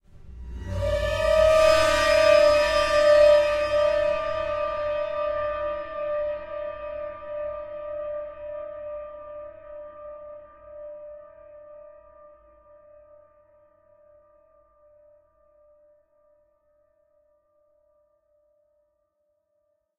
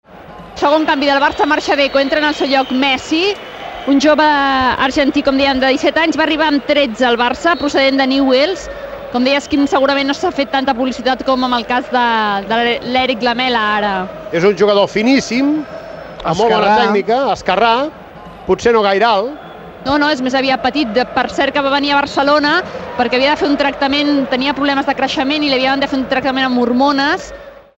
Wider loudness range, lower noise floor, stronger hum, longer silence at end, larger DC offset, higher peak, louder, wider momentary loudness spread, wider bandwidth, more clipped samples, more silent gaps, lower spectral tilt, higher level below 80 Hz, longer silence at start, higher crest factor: first, 25 LU vs 2 LU; first, -74 dBFS vs -34 dBFS; neither; first, 8.2 s vs 0.25 s; neither; second, -6 dBFS vs 0 dBFS; second, -23 LUFS vs -14 LUFS; first, 24 LU vs 7 LU; second, 13.5 kHz vs 16 kHz; neither; neither; about the same, -3.5 dB/octave vs -4 dB/octave; about the same, -44 dBFS vs -44 dBFS; about the same, 0.15 s vs 0.15 s; first, 20 dB vs 14 dB